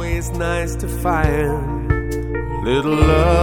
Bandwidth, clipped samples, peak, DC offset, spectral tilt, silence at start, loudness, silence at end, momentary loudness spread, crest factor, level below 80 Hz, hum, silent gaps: 17 kHz; under 0.1%; -2 dBFS; under 0.1%; -6.5 dB/octave; 0 s; -19 LUFS; 0 s; 9 LU; 16 dB; -24 dBFS; none; none